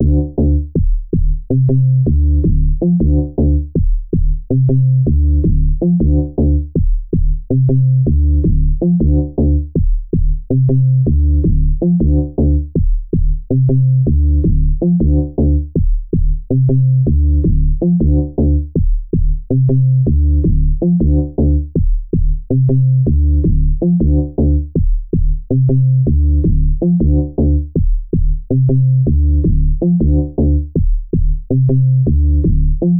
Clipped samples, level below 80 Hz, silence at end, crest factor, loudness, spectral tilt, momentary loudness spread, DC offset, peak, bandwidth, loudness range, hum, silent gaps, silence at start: under 0.1%; -16 dBFS; 0 s; 8 dB; -15 LUFS; -18 dB/octave; 6 LU; under 0.1%; -4 dBFS; 1 kHz; 0 LU; none; none; 0 s